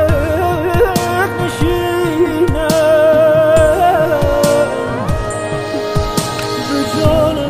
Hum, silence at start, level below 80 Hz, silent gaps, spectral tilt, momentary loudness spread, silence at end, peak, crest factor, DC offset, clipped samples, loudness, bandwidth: none; 0 s; -28 dBFS; none; -5.5 dB/octave; 9 LU; 0 s; 0 dBFS; 12 dB; under 0.1%; under 0.1%; -14 LUFS; 15.5 kHz